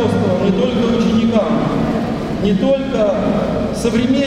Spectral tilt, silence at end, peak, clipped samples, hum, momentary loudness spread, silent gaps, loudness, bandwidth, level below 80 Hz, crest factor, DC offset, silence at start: -7 dB/octave; 0 s; -2 dBFS; under 0.1%; none; 4 LU; none; -16 LUFS; 11.5 kHz; -34 dBFS; 12 dB; under 0.1%; 0 s